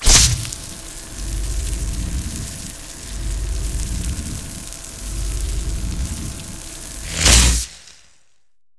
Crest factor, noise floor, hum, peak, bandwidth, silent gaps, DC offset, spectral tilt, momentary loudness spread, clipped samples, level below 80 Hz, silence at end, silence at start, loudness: 20 dB; -71 dBFS; none; 0 dBFS; 11 kHz; none; 0.3%; -2 dB/octave; 19 LU; under 0.1%; -24 dBFS; 0.85 s; 0 s; -21 LUFS